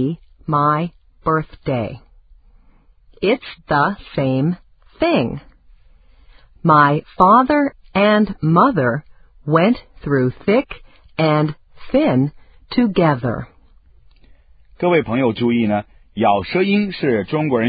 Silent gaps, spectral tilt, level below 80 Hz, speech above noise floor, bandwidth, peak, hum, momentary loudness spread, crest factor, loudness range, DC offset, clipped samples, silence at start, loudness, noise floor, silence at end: none; -10.5 dB/octave; -46 dBFS; 34 dB; 5 kHz; 0 dBFS; none; 12 LU; 18 dB; 7 LU; under 0.1%; under 0.1%; 0 s; -17 LUFS; -51 dBFS; 0 s